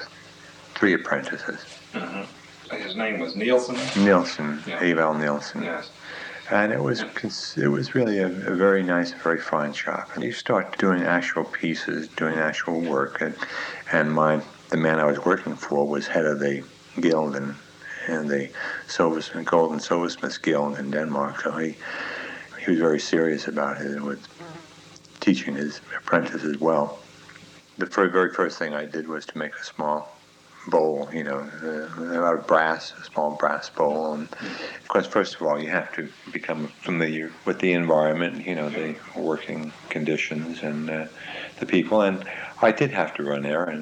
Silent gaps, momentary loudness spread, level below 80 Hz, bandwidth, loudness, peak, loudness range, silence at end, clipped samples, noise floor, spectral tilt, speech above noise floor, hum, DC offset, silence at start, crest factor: none; 13 LU; -72 dBFS; 10 kHz; -25 LUFS; -4 dBFS; 3 LU; 0 s; under 0.1%; -49 dBFS; -5.5 dB/octave; 25 dB; none; under 0.1%; 0 s; 20 dB